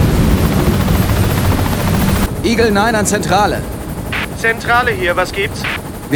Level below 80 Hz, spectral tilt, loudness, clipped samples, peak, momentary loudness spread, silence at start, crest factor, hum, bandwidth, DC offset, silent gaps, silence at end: -24 dBFS; -5 dB/octave; -14 LUFS; under 0.1%; 0 dBFS; 7 LU; 0 s; 14 dB; none; over 20 kHz; under 0.1%; none; 0 s